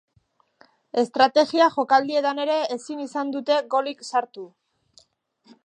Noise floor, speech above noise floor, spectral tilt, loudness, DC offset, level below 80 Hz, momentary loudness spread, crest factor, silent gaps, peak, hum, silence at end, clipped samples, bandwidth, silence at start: -65 dBFS; 43 dB; -3 dB/octave; -22 LUFS; under 0.1%; -74 dBFS; 12 LU; 20 dB; none; -4 dBFS; none; 1.2 s; under 0.1%; 9.8 kHz; 0.95 s